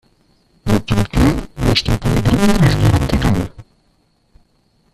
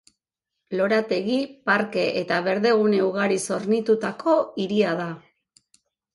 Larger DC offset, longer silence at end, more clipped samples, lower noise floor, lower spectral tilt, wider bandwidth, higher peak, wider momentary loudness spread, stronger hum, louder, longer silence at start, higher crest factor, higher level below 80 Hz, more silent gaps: neither; first, 1.3 s vs 0.95 s; neither; second, -59 dBFS vs -83 dBFS; about the same, -6 dB/octave vs -5 dB/octave; first, 14.5 kHz vs 11.5 kHz; first, 0 dBFS vs -6 dBFS; about the same, 7 LU vs 6 LU; neither; first, -15 LUFS vs -23 LUFS; about the same, 0.65 s vs 0.7 s; about the same, 16 dB vs 16 dB; first, -26 dBFS vs -68 dBFS; neither